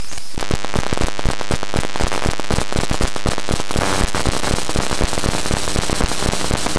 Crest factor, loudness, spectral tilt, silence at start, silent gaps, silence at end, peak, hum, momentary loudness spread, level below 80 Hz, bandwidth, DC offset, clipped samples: 16 dB; -21 LUFS; -4 dB/octave; 0 s; none; 0 s; -2 dBFS; none; 4 LU; -26 dBFS; 11 kHz; 10%; under 0.1%